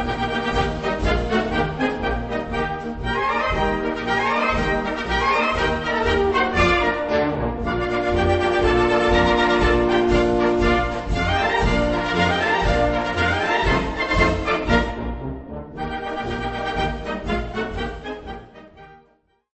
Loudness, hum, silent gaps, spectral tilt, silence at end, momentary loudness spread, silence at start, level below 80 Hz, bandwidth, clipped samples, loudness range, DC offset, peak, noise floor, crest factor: -21 LUFS; none; none; -6 dB/octave; 0.6 s; 10 LU; 0 s; -30 dBFS; 8.4 kHz; under 0.1%; 8 LU; under 0.1%; -4 dBFS; -60 dBFS; 18 dB